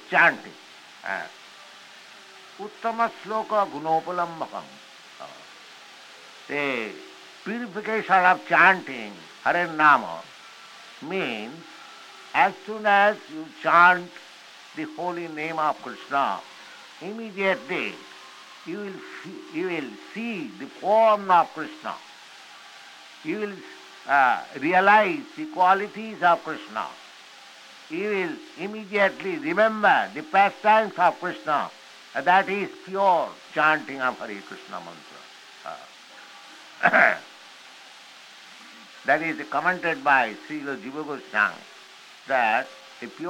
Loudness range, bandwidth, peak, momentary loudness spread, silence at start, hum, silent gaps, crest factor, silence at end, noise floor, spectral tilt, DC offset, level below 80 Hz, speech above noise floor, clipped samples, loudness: 9 LU; 16 kHz; -4 dBFS; 25 LU; 0.05 s; none; none; 22 dB; 0 s; -47 dBFS; -4.5 dB/octave; under 0.1%; -78 dBFS; 24 dB; under 0.1%; -23 LUFS